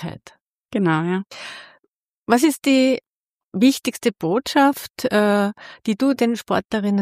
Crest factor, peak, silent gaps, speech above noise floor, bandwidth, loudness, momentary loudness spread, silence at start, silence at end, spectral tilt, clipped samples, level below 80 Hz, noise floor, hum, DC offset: 18 dB; -2 dBFS; 0.41-0.45 s, 2.17-2.23 s, 3.16-3.20 s; 54 dB; 15.5 kHz; -20 LUFS; 15 LU; 0 s; 0 s; -5 dB/octave; under 0.1%; -60 dBFS; -73 dBFS; none; under 0.1%